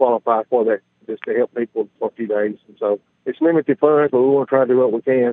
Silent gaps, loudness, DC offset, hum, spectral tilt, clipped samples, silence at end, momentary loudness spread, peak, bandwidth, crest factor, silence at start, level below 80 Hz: none; -18 LUFS; under 0.1%; none; -10.5 dB/octave; under 0.1%; 0 s; 10 LU; 0 dBFS; 3.9 kHz; 18 dB; 0 s; -74 dBFS